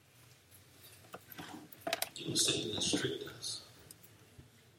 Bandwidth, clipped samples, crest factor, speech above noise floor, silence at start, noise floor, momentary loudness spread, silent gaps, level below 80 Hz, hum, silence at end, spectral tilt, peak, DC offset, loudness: 16.5 kHz; under 0.1%; 24 dB; 28 dB; 0.15 s; -63 dBFS; 25 LU; none; -72 dBFS; none; 0.3 s; -2 dB/octave; -16 dBFS; under 0.1%; -35 LUFS